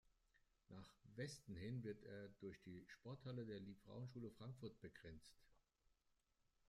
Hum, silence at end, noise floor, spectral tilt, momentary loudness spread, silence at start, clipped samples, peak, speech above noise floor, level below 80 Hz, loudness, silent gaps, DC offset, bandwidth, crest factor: none; 1.1 s; -85 dBFS; -6.5 dB/octave; 10 LU; 0.05 s; under 0.1%; -40 dBFS; 30 dB; -78 dBFS; -57 LUFS; none; under 0.1%; 14 kHz; 18 dB